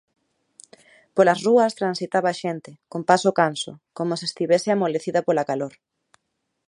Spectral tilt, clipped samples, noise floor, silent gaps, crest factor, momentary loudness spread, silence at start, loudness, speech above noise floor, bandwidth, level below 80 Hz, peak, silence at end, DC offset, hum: -5 dB/octave; under 0.1%; -77 dBFS; none; 22 dB; 12 LU; 1.15 s; -22 LUFS; 55 dB; 11.5 kHz; -74 dBFS; -2 dBFS; 1 s; under 0.1%; none